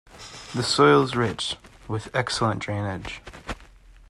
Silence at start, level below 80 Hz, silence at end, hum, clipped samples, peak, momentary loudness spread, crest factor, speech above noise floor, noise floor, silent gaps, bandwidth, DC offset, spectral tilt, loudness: 0.15 s; -48 dBFS; 0.2 s; none; under 0.1%; -4 dBFS; 20 LU; 20 dB; 26 dB; -49 dBFS; none; 12 kHz; under 0.1%; -4.5 dB/octave; -23 LUFS